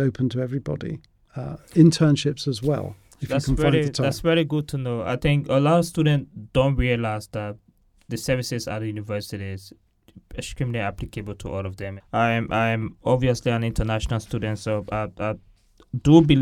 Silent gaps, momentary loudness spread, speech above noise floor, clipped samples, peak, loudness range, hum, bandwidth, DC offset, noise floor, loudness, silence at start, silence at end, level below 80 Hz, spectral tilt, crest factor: none; 15 LU; 28 dB; under 0.1%; -2 dBFS; 9 LU; none; 15.5 kHz; under 0.1%; -50 dBFS; -23 LUFS; 0 s; 0 s; -40 dBFS; -6.5 dB/octave; 22 dB